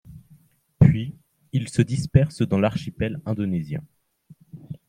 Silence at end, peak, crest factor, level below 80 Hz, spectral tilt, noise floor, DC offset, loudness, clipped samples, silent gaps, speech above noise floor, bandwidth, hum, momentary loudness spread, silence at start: 0.1 s; -2 dBFS; 22 dB; -44 dBFS; -8 dB/octave; -56 dBFS; under 0.1%; -23 LUFS; under 0.1%; none; 33 dB; 10.5 kHz; none; 14 LU; 0.1 s